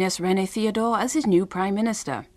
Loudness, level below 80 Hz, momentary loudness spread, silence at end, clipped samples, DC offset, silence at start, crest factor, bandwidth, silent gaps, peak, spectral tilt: -23 LUFS; -58 dBFS; 4 LU; 0.1 s; under 0.1%; under 0.1%; 0 s; 14 dB; 14.5 kHz; none; -10 dBFS; -5 dB/octave